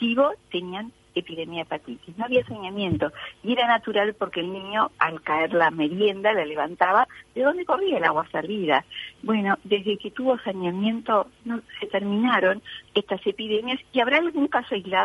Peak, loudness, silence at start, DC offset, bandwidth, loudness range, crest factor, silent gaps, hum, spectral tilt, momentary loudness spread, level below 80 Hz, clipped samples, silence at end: -4 dBFS; -24 LUFS; 0 s; under 0.1%; 11.5 kHz; 3 LU; 20 dB; none; none; -6.5 dB/octave; 11 LU; -62 dBFS; under 0.1%; 0 s